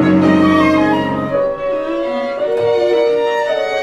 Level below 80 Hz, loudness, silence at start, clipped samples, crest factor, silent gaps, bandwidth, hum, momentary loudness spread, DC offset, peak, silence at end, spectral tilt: -46 dBFS; -15 LUFS; 0 s; under 0.1%; 14 dB; none; 9.4 kHz; none; 8 LU; under 0.1%; 0 dBFS; 0 s; -7 dB/octave